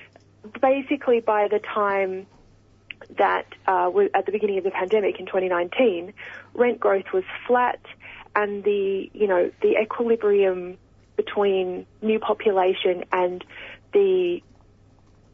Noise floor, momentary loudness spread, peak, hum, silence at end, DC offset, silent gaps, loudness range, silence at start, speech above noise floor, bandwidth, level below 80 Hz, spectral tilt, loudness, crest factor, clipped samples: -55 dBFS; 15 LU; -4 dBFS; none; 0.95 s; under 0.1%; none; 1 LU; 0 s; 32 dB; 3.8 kHz; -62 dBFS; -7 dB/octave; -23 LUFS; 18 dB; under 0.1%